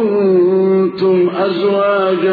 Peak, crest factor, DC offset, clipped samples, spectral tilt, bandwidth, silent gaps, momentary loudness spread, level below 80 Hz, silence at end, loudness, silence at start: -4 dBFS; 8 dB; under 0.1%; under 0.1%; -10 dB/octave; 4.9 kHz; none; 3 LU; -62 dBFS; 0 s; -13 LUFS; 0 s